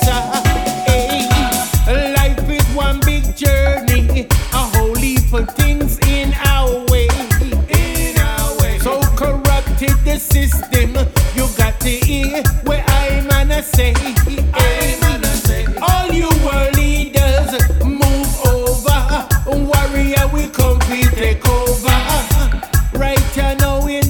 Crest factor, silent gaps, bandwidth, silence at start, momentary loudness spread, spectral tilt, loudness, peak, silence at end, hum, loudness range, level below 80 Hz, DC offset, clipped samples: 14 dB; none; over 20 kHz; 0 s; 2 LU; -4.5 dB/octave; -15 LUFS; 0 dBFS; 0 s; none; 1 LU; -16 dBFS; under 0.1%; under 0.1%